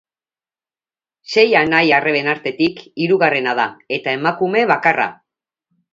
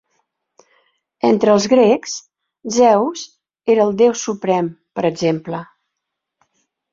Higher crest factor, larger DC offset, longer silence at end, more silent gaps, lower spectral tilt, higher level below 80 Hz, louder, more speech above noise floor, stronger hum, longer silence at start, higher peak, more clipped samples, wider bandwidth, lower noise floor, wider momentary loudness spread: about the same, 18 dB vs 16 dB; neither; second, 0.8 s vs 1.3 s; neither; about the same, -5.5 dB/octave vs -5 dB/octave; about the same, -62 dBFS vs -62 dBFS; about the same, -16 LUFS vs -16 LUFS; first, over 74 dB vs 64 dB; neither; about the same, 1.3 s vs 1.25 s; about the same, 0 dBFS vs -2 dBFS; neither; about the same, 7.6 kHz vs 7.6 kHz; first, under -90 dBFS vs -79 dBFS; second, 8 LU vs 16 LU